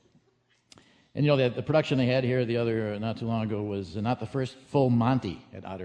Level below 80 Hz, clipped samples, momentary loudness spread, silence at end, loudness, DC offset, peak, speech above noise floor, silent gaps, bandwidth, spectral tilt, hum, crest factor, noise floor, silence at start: -60 dBFS; under 0.1%; 9 LU; 0 s; -27 LUFS; under 0.1%; -10 dBFS; 42 dB; none; 9.2 kHz; -8 dB/octave; none; 18 dB; -69 dBFS; 1.15 s